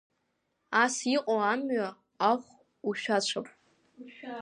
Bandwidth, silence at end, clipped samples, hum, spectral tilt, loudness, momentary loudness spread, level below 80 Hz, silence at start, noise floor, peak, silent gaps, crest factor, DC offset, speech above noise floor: 11.5 kHz; 0 s; under 0.1%; none; -3 dB/octave; -29 LUFS; 15 LU; -84 dBFS; 0.7 s; -78 dBFS; -10 dBFS; none; 20 dB; under 0.1%; 49 dB